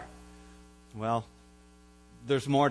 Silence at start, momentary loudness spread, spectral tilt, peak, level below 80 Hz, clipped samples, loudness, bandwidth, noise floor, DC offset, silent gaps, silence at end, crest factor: 0 s; 25 LU; -6 dB/octave; -12 dBFS; -58 dBFS; under 0.1%; -31 LUFS; 11 kHz; -57 dBFS; under 0.1%; none; 0 s; 20 dB